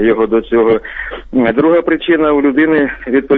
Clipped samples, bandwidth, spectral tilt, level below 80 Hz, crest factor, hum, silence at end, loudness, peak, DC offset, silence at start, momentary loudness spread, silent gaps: under 0.1%; 4.1 kHz; -9 dB/octave; -38 dBFS; 10 dB; none; 0 s; -12 LUFS; -2 dBFS; under 0.1%; 0 s; 6 LU; none